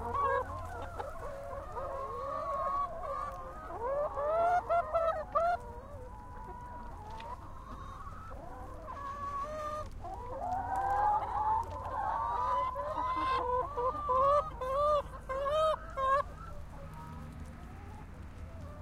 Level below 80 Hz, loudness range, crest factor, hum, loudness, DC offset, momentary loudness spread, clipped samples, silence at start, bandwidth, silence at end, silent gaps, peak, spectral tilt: -50 dBFS; 11 LU; 16 dB; none; -34 LUFS; under 0.1%; 17 LU; under 0.1%; 0 s; 15.5 kHz; 0 s; none; -18 dBFS; -6 dB/octave